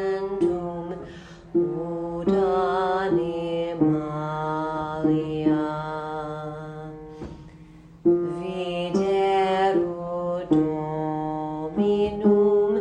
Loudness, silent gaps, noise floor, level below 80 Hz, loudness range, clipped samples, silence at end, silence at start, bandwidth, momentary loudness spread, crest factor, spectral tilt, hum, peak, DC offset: -24 LUFS; none; -47 dBFS; -52 dBFS; 4 LU; under 0.1%; 0 s; 0 s; 9.2 kHz; 14 LU; 16 dB; -8 dB/octave; none; -8 dBFS; under 0.1%